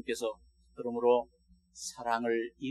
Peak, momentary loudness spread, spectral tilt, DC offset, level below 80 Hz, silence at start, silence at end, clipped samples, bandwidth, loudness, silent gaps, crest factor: -14 dBFS; 14 LU; -3.5 dB/octave; under 0.1%; -68 dBFS; 0.05 s; 0 s; under 0.1%; 13 kHz; -33 LUFS; none; 20 dB